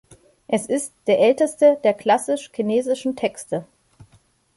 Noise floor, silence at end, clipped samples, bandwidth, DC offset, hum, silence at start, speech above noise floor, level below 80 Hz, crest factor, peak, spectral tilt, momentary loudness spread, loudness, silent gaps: -58 dBFS; 0.95 s; under 0.1%; 11.5 kHz; under 0.1%; none; 0.5 s; 39 dB; -66 dBFS; 18 dB; -4 dBFS; -4.5 dB/octave; 10 LU; -20 LUFS; none